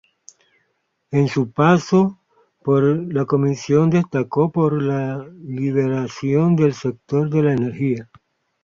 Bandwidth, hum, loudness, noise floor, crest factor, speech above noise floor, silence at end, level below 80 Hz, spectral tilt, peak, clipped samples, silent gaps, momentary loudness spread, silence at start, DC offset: 7.6 kHz; none; -19 LUFS; -70 dBFS; 16 dB; 52 dB; 0.6 s; -58 dBFS; -8 dB/octave; -2 dBFS; under 0.1%; none; 8 LU; 1.1 s; under 0.1%